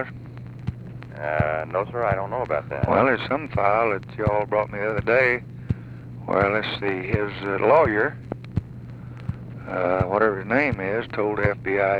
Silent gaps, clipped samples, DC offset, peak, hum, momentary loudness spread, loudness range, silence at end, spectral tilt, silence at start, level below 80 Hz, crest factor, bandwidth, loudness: none; under 0.1%; under 0.1%; -4 dBFS; none; 15 LU; 3 LU; 0 s; -8.5 dB/octave; 0 s; -44 dBFS; 18 dB; 7.2 kHz; -23 LUFS